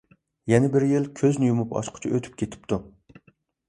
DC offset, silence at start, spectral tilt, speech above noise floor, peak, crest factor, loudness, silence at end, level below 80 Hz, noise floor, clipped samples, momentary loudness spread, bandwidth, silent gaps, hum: under 0.1%; 0.45 s; -7 dB/octave; 39 dB; -4 dBFS; 22 dB; -24 LUFS; 0.8 s; -56 dBFS; -62 dBFS; under 0.1%; 11 LU; 11 kHz; none; none